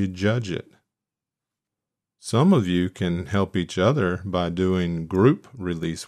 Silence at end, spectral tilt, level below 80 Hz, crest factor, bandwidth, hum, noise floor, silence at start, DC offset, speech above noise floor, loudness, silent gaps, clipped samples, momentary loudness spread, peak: 0 s; -7 dB/octave; -52 dBFS; 18 dB; 12.5 kHz; none; -88 dBFS; 0 s; under 0.1%; 66 dB; -23 LUFS; none; under 0.1%; 10 LU; -4 dBFS